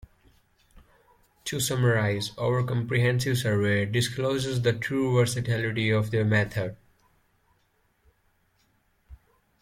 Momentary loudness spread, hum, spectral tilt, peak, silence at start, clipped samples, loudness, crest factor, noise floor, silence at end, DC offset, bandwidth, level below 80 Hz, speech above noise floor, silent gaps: 5 LU; none; -5.5 dB/octave; -10 dBFS; 0.75 s; under 0.1%; -26 LUFS; 16 dB; -69 dBFS; 0.45 s; under 0.1%; 15.5 kHz; -56 dBFS; 44 dB; none